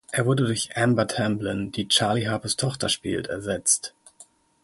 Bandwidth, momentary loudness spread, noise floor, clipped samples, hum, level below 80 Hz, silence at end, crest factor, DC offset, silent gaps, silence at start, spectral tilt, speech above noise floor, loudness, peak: 12 kHz; 8 LU; -54 dBFS; under 0.1%; none; -54 dBFS; 0.4 s; 18 dB; under 0.1%; none; 0.1 s; -3.5 dB/octave; 30 dB; -24 LUFS; -6 dBFS